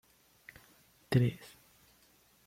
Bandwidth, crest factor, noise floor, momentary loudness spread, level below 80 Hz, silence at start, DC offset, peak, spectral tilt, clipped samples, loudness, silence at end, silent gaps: 16 kHz; 22 dB; -67 dBFS; 25 LU; -64 dBFS; 1.1 s; under 0.1%; -16 dBFS; -7.5 dB/octave; under 0.1%; -32 LUFS; 1.1 s; none